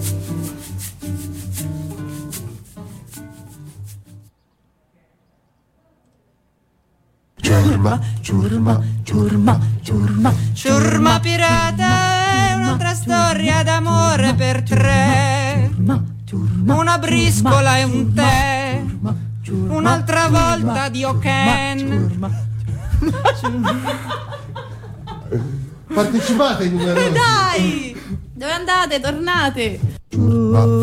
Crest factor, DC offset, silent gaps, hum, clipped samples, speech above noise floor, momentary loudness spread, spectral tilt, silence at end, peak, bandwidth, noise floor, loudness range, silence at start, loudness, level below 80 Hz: 14 dB; under 0.1%; none; none; under 0.1%; 46 dB; 15 LU; -5.5 dB/octave; 0 s; -4 dBFS; 15.5 kHz; -62 dBFS; 9 LU; 0 s; -17 LUFS; -36 dBFS